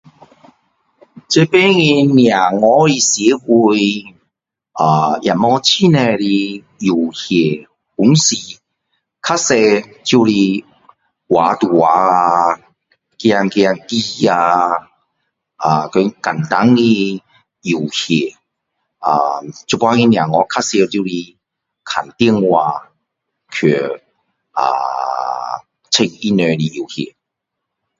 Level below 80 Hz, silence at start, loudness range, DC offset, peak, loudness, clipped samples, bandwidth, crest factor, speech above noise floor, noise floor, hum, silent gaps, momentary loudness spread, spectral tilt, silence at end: -56 dBFS; 1.3 s; 6 LU; under 0.1%; 0 dBFS; -14 LUFS; under 0.1%; 7.8 kHz; 14 dB; 65 dB; -78 dBFS; none; none; 13 LU; -4.5 dB/octave; 0.95 s